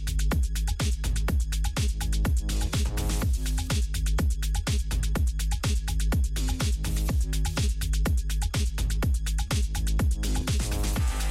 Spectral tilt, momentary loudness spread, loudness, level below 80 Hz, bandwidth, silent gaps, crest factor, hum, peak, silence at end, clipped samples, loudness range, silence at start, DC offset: -4.5 dB/octave; 2 LU; -28 LUFS; -26 dBFS; 15.5 kHz; none; 10 dB; none; -16 dBFS; 0 s; under 0.1%; 0 LU; 0 s; under 0.1%